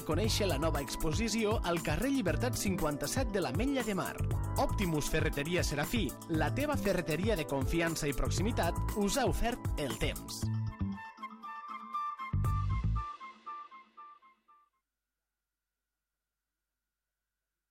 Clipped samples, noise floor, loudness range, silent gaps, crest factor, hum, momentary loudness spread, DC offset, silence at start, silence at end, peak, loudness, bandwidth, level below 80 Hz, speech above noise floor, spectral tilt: under 0.1%; under -90 dBFS; 7 LU; none; 16 dB; none; 12 LU; under 0.1%; 0 s; 3.55 s; -18 dBFS; -34 LUFS; 16.5 kHz; -42 dBFS; over 58 dB; -5 dB/octave